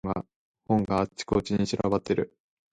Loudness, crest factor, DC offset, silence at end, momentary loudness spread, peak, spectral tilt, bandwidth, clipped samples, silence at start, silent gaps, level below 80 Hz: -28 LUFS; 18 dB; under 0.1%; 0.45 s; 9 LU; -12 dBFS; -6.5 dB/octave; 9.4 kHz; under 0.1%; 0.05 s; 0.36-0.54 s; -50 dBFS